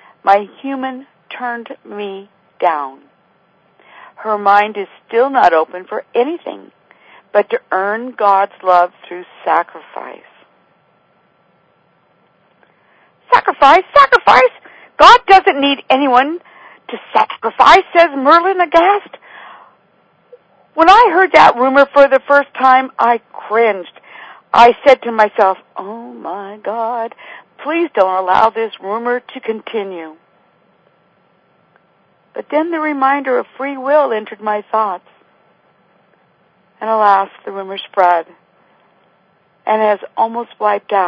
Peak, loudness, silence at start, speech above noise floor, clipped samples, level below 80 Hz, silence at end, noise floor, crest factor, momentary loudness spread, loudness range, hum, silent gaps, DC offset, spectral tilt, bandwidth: 0 dBFS; -12 LUFS; 0.25 s; 43 dB; 0.7%; -52 dBFS; 0 s; -56 dBFS; 14 dB; 19 LU; 12 LU; none; none; under 0.1%; -4 dB/octave; 8 kHz